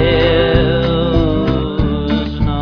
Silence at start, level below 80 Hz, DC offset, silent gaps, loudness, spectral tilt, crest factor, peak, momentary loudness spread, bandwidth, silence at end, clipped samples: 0 s; -22 dBFS; under 0.1%; none; -15 LUFS; -8.5 dB/octave; 12 dB; -2 dBFS; 5 LU; 5.4 kHz; 0 s; under 0.1%